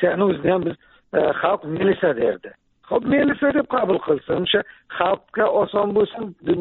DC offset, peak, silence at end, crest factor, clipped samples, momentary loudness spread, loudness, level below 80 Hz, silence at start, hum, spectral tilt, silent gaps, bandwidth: under 0.1%; -4 dBFS; 0 s; 16 dB; under 0.1%; 6 LU; -21 LUFS; -54 dBFS; 0 s; none; -4 dB/octave; none; 4.2 kHz